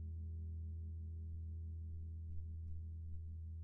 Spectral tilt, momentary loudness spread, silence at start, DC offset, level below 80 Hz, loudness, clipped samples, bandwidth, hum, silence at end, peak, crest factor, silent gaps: -17.5 dB/octave; 2 LU; 0 s; under 0.1%; -54 dBFS; -49 LUFS; under 0.1%; 0.6 kHz; none; 0 s; -36 dBFS; 12 dB; none